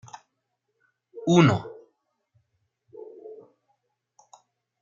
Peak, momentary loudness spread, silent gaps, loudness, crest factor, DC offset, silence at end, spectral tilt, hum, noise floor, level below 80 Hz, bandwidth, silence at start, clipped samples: -4 dBFS; 27 LU; none; -22 LUFS; 24 dB; under 0.1%; 1.5 s; -6.5 dB/octave; none; -79 dBFS; -68 dBFS; 7.4 kHz; 1.15 s; under 0.1%